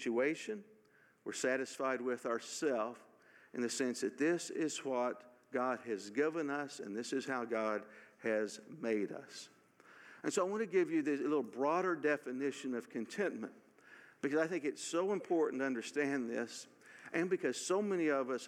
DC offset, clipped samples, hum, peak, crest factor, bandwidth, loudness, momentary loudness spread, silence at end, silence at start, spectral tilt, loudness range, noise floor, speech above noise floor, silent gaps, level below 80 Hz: under 0.1%; under 0.1%; none; -20 dBFS; 18 dB; 15 kHz; -38 LUFS; 11 LU; 0 s; 0 s; -4 dB/octave; 3 LU; -69 dBFS; 32 dB; none; under -90 dBFS